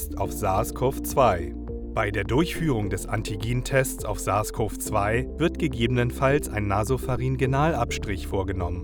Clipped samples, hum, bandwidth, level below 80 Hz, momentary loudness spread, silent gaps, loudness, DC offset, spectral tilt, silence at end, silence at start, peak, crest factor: under 0.1%; none; over 20 kHz; -36 dBFS; 6 LU; none; -25 LUFS; under 0.1%; -5.5 dB/octave; 0 s; 0 s; -6 dBFS; 18 dB